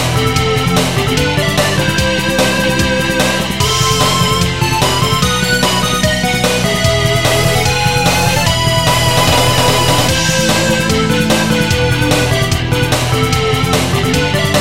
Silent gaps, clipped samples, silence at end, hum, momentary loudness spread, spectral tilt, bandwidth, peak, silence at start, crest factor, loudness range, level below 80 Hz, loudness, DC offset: none; under 0.1%; 0 s; none; 3 LU; -4 dB/octave; 16.5 kHz; 0 dBFS; 0 s; 12 dB; 2 LU; -28 dBFS; -12 LUFS; 2%